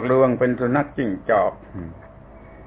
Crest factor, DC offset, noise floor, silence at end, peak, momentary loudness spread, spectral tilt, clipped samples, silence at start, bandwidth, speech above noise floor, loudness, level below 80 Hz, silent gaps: 16 dB; under 0.1%; -43 dBFS; 0 s; -6 dBFS; 18 LU; -11.5 dB/octave; under 0.1%; 0 s; 4 kHz; 23 dB; -21 LUFS; -48 dBFS; none